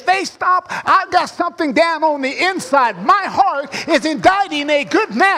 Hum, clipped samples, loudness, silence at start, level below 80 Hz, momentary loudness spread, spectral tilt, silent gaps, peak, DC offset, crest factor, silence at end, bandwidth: none; under 0.1%; -15 LUFS; 0 s; -56 dBFS; 4 LU; -3.5 dB/octave; none; -2 dBFS; under 0.1%; 14 dB; 0 s; 15 kHz